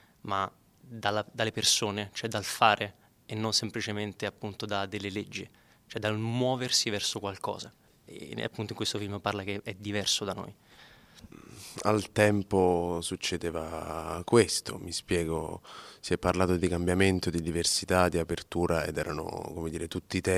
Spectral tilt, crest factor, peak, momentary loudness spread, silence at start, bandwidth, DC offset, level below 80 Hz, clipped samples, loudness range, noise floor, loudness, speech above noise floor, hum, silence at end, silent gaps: -4 dB/octave; 24 dB; -6 dBFS; 14 LU; 0.25 s; 16 kHz; under 0.1%; -54 dBFS; under 0.1%; 5 LU; -56 dBFS; -30 LUFS; 26 dB; none; 0 s; none